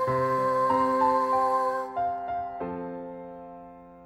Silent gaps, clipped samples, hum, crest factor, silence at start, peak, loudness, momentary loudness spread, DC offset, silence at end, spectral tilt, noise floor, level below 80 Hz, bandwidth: none; under 0.1%; none; 14 dB; 0 s; -14 dBFS; -26 LUFS; 19 LU; under 0.1%; 0 s; -7 dB/octave; -47 dBFS; -60 dBFS; 14 kHz